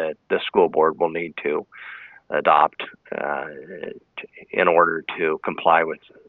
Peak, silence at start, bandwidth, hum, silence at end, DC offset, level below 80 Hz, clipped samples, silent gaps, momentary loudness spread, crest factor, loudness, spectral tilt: -2 dBFS; 0 s; 4.3 kHz; none; 0.3 s; under 0.1%; -66 dBFS; under 0.1%; none; 20 LU; 20 dB; -21 LUFS; -8 dB/octave